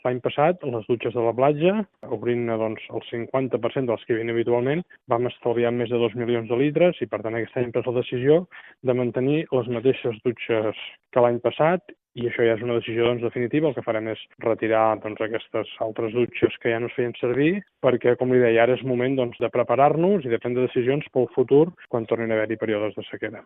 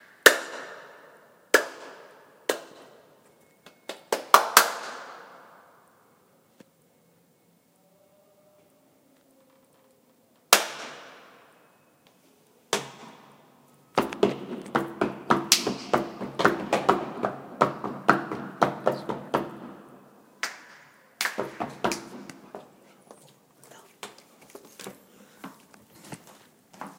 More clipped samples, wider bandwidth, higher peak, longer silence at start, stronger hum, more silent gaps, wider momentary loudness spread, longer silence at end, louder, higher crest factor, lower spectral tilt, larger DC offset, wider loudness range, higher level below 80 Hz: neither; second, 3.9 kHz vs 16.5 kHz; second, -4 dBFS vs 0 dBFS; second, 0.05 s vs 0.25 s; neither; neither; second, 9 LU vs 26 LU; about the same, 0.05 s vs 0.05 s; about the same, -23 LUFS vs -25 LUFS; second, 18 dB vs 30 dB; first, -5.5 dB/octave vs -2 dB/octave; neither; second, 4 LU vs 20 LU; about the same, -64 dBFS vs -68 dBFS